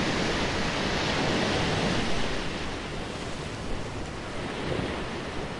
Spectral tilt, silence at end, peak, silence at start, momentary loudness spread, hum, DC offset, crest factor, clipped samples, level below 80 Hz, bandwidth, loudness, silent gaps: -4.5 dB/octave; 0 s; -14 dBFS; 0 s; 9 LU; none; under 0.1%; 16 dB; under 0.1%; -40 dBFS; 11.5 kHz; -29 LUFS; none